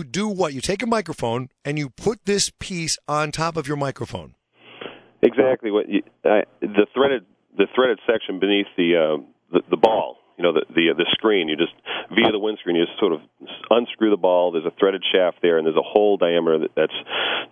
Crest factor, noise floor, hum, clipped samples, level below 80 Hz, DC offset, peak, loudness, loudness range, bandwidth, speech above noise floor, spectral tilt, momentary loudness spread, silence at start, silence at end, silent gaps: 20 dB; -40 dBFS; none; under 0.1%; -56 dBFS; under 0.1%; 0 dBFS; -21 LUFS; 5 LU; 11 kHz; 20 dB; -4 dB/octave; 9 LU; 0 s; 0.05 s; none